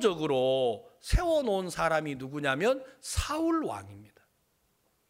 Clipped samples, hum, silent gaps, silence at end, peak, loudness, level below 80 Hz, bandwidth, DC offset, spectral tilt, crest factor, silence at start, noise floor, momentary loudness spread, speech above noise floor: under 0.1%; none; none; 1.05 s; -12 dBFS; -30 LUFS; -40 dBFS; 16 kHz; under 0.1%; -5 dB/octave; 18 dB; 0 s; -72 dBFS; 9 LU; 43 dB